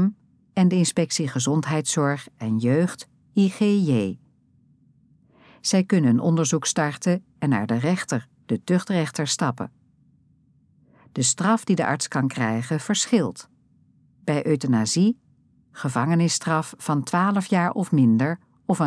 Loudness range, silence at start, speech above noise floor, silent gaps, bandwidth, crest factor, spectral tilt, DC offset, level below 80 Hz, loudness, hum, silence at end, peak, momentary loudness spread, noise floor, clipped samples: 3 LU; 0 s; 38 dB; none; 11 kHz; 16 dB; -5 dB/octave; under 0.1%; -70 dBFS; -23 LUFS; none; 0 s; -6 dBFS; 10 LU; -60 dBFS; under 0.1%